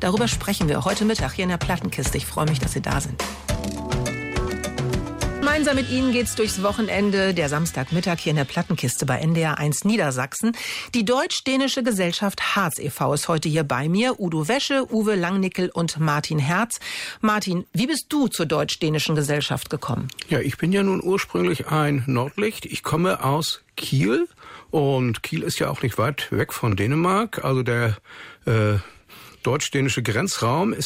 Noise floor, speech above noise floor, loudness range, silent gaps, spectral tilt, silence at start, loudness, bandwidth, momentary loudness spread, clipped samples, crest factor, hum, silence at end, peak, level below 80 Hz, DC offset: -46 dBFS; 24 dB; 2 LU; none; -5 dB/octave; 0 s; -23 LUFS; 16 kHz; 6 LU; under 0.1%; 12 dB; none; 0 s; -10 dBFS; -42 dBFS; under 0.1%